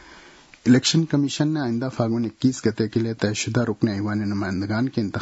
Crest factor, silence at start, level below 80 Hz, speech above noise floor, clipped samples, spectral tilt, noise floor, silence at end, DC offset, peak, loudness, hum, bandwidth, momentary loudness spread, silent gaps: 18 dB; 0.05 s; -58 dBFS; 26 dB; under 0.1%; -5.5 dB/octave; -48 dBFS; 0 s; under 0.1%; -4 dBFS; -23 LUFS; none; 8 kHz; 7 LU; none